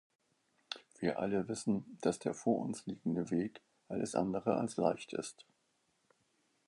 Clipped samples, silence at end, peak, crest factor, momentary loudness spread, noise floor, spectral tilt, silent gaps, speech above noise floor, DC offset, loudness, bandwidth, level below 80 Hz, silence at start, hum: under 0.1%; 1.25 s; -16 dBFS; 22 dB; 9 LU; -78 dBFS; -6 dB/octave; none; 42 dB; under 0.1%; -37 LUFS; 11.5 kHz; -72 dBFS; 0.7 s; none